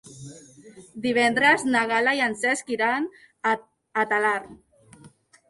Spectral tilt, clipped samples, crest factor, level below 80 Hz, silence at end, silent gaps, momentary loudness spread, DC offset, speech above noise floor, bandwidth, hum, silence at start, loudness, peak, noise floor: -3 dB/octave; under 0.1%; 18 dB; -66 dBFS; 0.4 s; none; 15 LU; under 0.1%; 29 dB; 11.5 kHz; none; 0.05 s; -23 LUFS; -6 dBFS; -53 dBFS